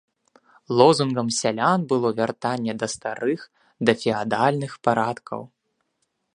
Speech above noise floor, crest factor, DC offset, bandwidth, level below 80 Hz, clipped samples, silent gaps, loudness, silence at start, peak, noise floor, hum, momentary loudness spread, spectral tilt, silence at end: 52 dB; 22 dB; under 0.1%; 11 kHz; -66 dBFS; under 0.1%; none; -22 LUFS; 0.7 s; 0 dBFS; -74 dBFS; none; 11 LU; -5 dB/octave; 0.9 s